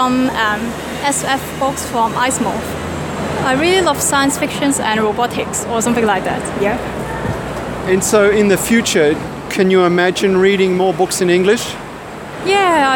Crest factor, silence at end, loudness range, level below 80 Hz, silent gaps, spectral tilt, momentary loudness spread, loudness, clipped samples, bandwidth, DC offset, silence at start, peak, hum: 14 dB; 0 s; 4 LU; -40 dBFS; none; -4 dB/octave; 10 LU; -15 LUFS; under 0.1%; 17.5 kHz; under 0.1%; 0 s; 0 dBFS; none